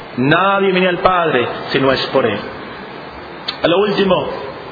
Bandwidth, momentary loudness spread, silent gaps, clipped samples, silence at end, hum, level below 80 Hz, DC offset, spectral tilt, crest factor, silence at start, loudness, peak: 5 kHz; 16 LU; none; under 0.1%; 0 s; none; -46 dBFS; under 0.1%; -7 dB/octave; 16 dB; 0 s; -15 LUFS; 0 dBFS